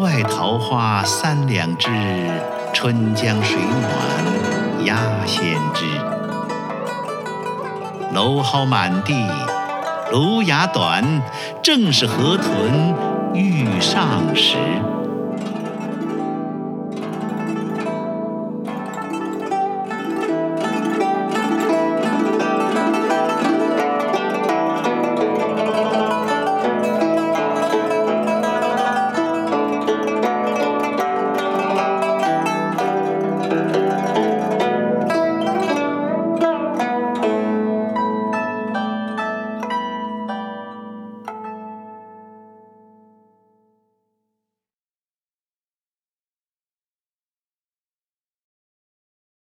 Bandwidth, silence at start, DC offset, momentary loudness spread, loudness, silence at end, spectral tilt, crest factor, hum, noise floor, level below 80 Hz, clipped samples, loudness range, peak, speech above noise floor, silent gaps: 16.5 kHz; 0 s; under 0.1%; 9 LU; -19 LUFS; 7.1 s; -5 dB/octave; 18 dB; none; under -90 dBFS; -70 dBFS; under 0.1%; 8 LU; -2 dBFS; over 72 dB; none